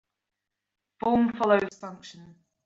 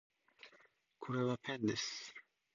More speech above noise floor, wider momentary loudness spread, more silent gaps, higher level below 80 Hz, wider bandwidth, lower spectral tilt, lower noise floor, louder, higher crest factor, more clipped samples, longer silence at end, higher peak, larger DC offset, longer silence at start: first, 60 dB vs 31 dB; about the same, 20 LU vs 21 LU; neither; first, -62 dBFS vs -78 dBFS; about the same, 7.8 kHz vs 7.2 kHz; first, -6.5 dB/octave vs -4.5 dB/octave; first, -86 dBFS vs -70 dBFS; first, -25 LUFS vs -40 LUFS; about the same, 22 dB vs 18 dB; neither; about the same, 0.4 s vs 0.35 s; first, -8 dBFS vs -24 dBFS; neither; first, 1.05 s vs 0.45 s